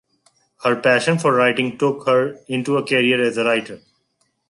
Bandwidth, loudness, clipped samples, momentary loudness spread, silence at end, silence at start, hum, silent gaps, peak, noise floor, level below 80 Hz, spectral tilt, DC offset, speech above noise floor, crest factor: 11.5 kHz; -18 LUFS; under 0.1%; 7 LU; 0.75 s; 0.6 s; none; none; -4 dBFS; -68 dBFS; -68 dBFS; -5 dB/octave; under 0.1%; 50 dB; 16 dB